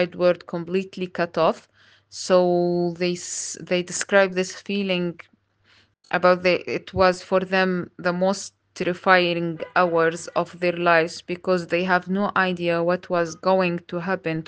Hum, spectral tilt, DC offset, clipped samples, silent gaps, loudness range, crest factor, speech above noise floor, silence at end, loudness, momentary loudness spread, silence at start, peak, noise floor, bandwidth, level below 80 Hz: none; -4.5 dB/octave; under 0.1%; under 0.1%; none; 2 LU; 22 dB; 37 dB; 0.05 s; -22 LUFS; 9 LU; 0 s; 0 dBFS; -60 dBFS; 10 kHz; -60 dBFS